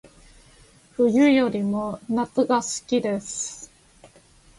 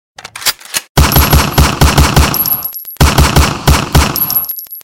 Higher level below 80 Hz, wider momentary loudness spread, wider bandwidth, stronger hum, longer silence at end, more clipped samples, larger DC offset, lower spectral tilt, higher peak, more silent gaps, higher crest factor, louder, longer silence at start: second, -58 dBFS vs -16 dBFS; first, 12 LU vs 7 LU; second, 11.5 kHz vs 17.5 kHz; neither; first, 0.95 s vs 0.05 s; neither; neither; about the same, -4.5 dB/octave vs -4 dB/octave; second, -8 dBFS vs 0 dBFS; second, none vs 0.89-0.95 s; first, 18 dB vs 10 dB; second, -23 LUFS vs -10 LUFS; first, 1 s vs 0.25 s